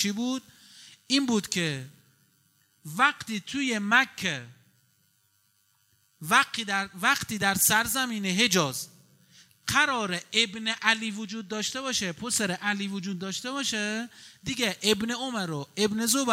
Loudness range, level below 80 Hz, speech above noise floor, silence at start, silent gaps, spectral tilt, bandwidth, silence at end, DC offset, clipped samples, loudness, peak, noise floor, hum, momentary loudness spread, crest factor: 5 LU; -66 dBFS; 41 dB; 0 s; none; -2.5 dB/octave; 16 kHz; 0 s; under 0.1%; under 0.1%; -26 LUFS; -4 dBFS; -69 dBFS; none; 12 LU; 24 dB